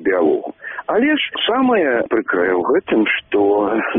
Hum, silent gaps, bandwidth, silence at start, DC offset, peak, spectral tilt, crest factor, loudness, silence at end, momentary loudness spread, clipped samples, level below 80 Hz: none; none; 3.8 kHz; 0 s; under 0.1%; -6 dBFS; -2 dB/octave; 10 dB; -17 LUFS; 0 s; 4 LU; under 0.1%; -56 dBFS